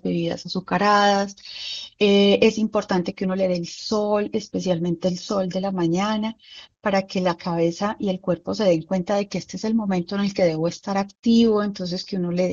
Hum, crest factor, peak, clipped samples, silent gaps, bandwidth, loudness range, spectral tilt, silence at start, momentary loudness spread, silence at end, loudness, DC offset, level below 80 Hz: none; 18 dB; -4 dBFS; under 0.1%; none; 7.6 kHz; 4 LU; -6 dB/octave; 0.05 s; 10 LU; 0 s; -22 LUFS; under 0.1%; -58 dBFS